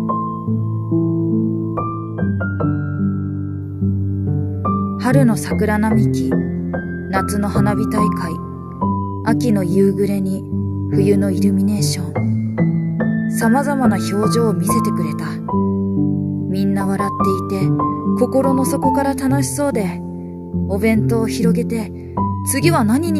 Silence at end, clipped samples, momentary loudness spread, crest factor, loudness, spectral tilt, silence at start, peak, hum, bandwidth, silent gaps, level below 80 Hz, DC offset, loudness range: 0 s; under 0.1%; 7 LU; 16 dB; -18 LUFS; -7 dB/octave; 0 s; 0 dBFS; none; 14.5 kHz; none; -44 dBFS; under 0.1%; 3 LU